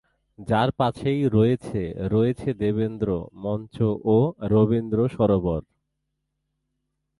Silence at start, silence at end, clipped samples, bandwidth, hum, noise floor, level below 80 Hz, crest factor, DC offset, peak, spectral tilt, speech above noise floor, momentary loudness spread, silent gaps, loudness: 0.4 s; 1.6 s; under 0.1%; 11.5 kHz; none; -78 dBFS; -46 dBFS; 16 dB; under 0.1%; -6 dBFS; -9 dB/octave; 56 dB; 9 LU; none; -23 LUFS